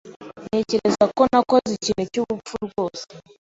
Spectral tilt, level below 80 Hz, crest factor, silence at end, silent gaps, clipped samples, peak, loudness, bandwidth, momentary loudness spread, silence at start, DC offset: -5 dB/octave; -54 dBFS; 18 dB; 0.2 s; 0.16-0.20 s; under 0.1%; -4 dBFS; -21 LUFS; 8 kHz; 19 LU; 0.05 s; under 0.1%